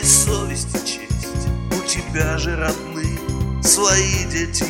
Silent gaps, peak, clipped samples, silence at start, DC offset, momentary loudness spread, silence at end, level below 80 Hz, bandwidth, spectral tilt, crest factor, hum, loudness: none; 0 dBFS; under 0.1%; 0 s; under 0.1%; 11 LU; 0 s; -28 dBFS; 17 kHz; -3 dB/octave; 20 dB; none; -19 LUFS